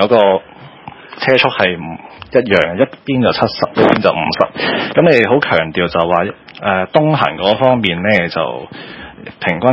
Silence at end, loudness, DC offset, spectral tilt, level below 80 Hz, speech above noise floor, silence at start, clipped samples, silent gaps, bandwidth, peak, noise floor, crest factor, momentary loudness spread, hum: 0 s; -13 LUFS; under 0.1%; -7.5 dB/octave; -44 dBFS; 21 dB; 0 s; 0.1%; none; 8 kHz; 0 dBFS; -34 dBFS; 14 dB; 16 LU; none